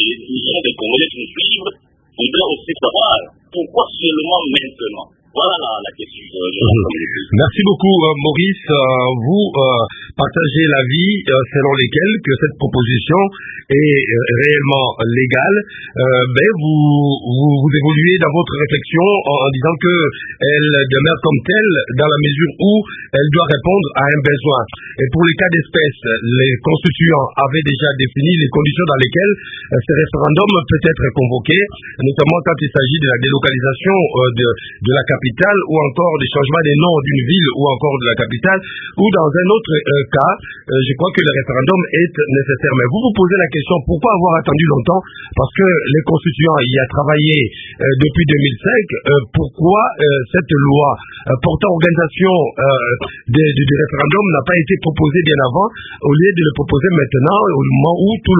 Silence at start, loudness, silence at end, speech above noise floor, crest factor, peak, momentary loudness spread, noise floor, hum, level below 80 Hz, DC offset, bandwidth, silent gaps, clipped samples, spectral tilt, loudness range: 0 s; -13 LUFS; 0 s; 22 dB; 14 dB; 0 dBFS; 6 LU; -36 dBFS; none; -38 dBFS; under 0.1%; 3.9 kHz; none; under 0.1%; -9 dB/octave; 2 LU